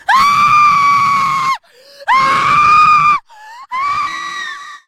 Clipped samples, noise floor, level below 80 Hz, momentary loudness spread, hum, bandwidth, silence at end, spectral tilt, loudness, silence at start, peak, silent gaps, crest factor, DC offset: under 0.1%; -40 dBFS; -48 dBFS; 15 LU; none; 16 kHz; 0.1 s; -2 dB/octave; -10 LUFS; 0.1 s; 0 dBFS; none; 12 dB; under 0.1%